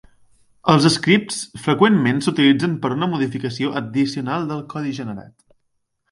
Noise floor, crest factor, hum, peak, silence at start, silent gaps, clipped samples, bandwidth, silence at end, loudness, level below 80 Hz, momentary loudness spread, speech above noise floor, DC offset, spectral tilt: -70 dBFS; 20 dB; none; 0 dBFS; 0.65 s; none; under 0.1%; 11.5 kHz; 0.9 s; -19 LUFS; -58 dBFS; 12 LU; 52 dB; under 0.1%; -5.5 dB/octave